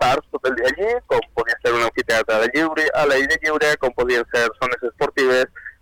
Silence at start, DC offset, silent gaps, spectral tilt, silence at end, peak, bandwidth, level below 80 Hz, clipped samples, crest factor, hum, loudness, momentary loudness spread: 0 s; under 0.1%; none; -3.5 dB/octave; 0.1 s; -12 dBFS; 18.5 kHz; -46 dBFS; under 0.1%; 8 dB; none; -19 LUFS; 5 LU